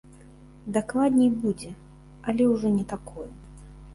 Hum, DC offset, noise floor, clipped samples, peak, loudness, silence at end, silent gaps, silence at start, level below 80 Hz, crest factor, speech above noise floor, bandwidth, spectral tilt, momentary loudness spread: none; under 0.1%; -49 dBFS; under 0.1%; -10 dBFS; -25 LUFS; 0 s; none; 0.4 s; -50 dBFS; 16 dB; 25 dB; 11.5 kHz; -7 dB/octave; 20 LU